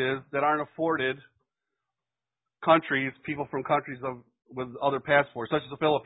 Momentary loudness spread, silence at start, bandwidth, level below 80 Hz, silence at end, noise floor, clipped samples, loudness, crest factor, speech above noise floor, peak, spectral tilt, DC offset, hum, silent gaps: 14 LU; 0 s; 4 kHz; -66 dBFS; 0.05 s; under -90 dBFS; under 0.1%; -28 LUFS; 22 dB; over 63 dB; -6 dBFS; -9.5 dB/octave; under 0.1%; none; none